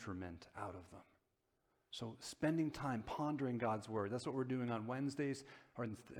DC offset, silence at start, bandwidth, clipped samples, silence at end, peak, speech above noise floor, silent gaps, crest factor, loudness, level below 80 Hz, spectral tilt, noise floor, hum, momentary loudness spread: under 0.1%; 0 s; 16 kHz; under 0.1%; 0 s; -24 dBFS; 41 dB; none; 18 dB; -43 LUFS; -72 dBFS; -6.5 dB/octave; -84 dBFS; none; 12 LU